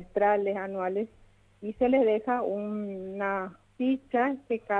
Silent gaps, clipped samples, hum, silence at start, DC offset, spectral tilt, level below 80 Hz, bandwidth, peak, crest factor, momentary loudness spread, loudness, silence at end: none; under 0.1%; none; 0 s; under 0.1%; -8 dB/octave; -62 dBFS; 4.1 kHz; -12 dBFS; 16 dB; 12 LU; -29 LUFS; 0 s